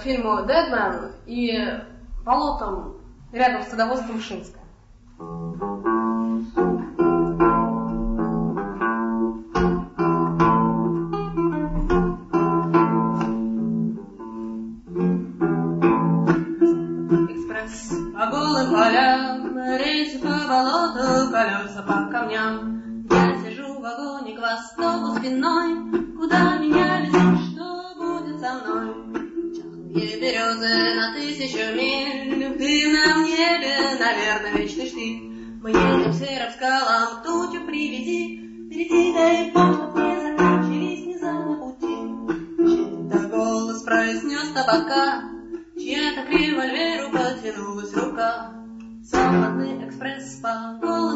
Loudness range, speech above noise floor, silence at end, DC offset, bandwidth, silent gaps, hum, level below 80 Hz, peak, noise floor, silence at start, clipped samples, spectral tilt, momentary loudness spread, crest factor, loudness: 5 LU; 25 dB; 0 s; under 0.1%; 8 kHz; none; none; -42 dBFS; -4 dBFS; -48 dBFS; 0 s; under 0.1%; -5.5 dB/octave; 13 LU; 18 dB; -22 LUFS